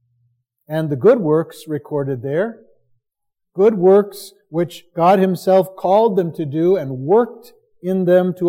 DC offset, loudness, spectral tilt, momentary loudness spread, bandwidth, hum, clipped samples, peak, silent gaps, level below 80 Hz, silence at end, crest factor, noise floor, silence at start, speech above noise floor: under 0.1%; -17 LUFS; -8 dB/octave; 13 LU; 16 kHz; none; under 0.1%; -2 dBFS; none; -70 dBFS; 0 s; 16 dB; -80 dBFS; 0.7 s; 64 dB